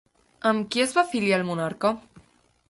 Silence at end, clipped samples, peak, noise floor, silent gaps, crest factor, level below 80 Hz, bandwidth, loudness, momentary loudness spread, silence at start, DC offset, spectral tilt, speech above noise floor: 0.5 s; under 0.1%; -6 dBFS; -61 dBFS; none; 20 dB; -64 dBFS; 11.5 kHz; -24 LUFS; 5 LU; 0.45 s; under 0.1%; -4.5 dB/octave; 37 dB